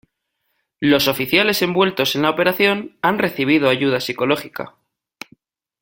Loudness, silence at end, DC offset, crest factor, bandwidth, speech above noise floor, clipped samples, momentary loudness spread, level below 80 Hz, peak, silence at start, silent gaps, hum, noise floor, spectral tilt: -17 LUFS; 1.15 s; under 0.1%; 18 dB; 17 kHz; 55 dB; under 0.1%; 18 LU; -58 dBFS; 0 dBFS; 0.8 s; none; none; -73 dBFS; -4.5 dB/octave